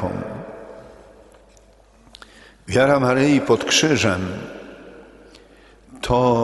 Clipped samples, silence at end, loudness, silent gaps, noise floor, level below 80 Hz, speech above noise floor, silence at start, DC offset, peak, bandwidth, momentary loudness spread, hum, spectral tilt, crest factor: under 0.1%; 0 s; -18 LUFS; none; -51 dBFS; -46 dBFS; 34 dB; 0 s; under 0.1%; -2 dBFS; 11.5 kHz; 23 LU; none; -4.5 dB/octave; 20 dB